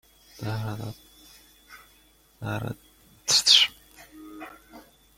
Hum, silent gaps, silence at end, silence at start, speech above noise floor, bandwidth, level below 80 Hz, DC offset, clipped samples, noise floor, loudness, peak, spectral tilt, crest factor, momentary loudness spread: none; none; 0.35 s; 0.4 s; 27 dB; 16.5 kHz; -62 dBFS; under 0.1%; under 0.1%; -59 dBFS; -22 LUFS; -4 dBFS; -1.5 dB/octave; 26 dB; 27 LU